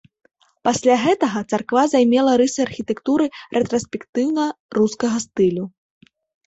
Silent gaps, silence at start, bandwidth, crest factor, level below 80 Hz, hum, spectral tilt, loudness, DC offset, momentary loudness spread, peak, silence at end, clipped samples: 4.09-4.13 s, 4.60-4.69 s; 0.65 s; 8.2 kHz; 16 dB; -58 dBFS; none; -5 dB/octave; -19 LUFS; under 0.1%; 9 LU; -4 dBFS; 0.8 s; under 0.1%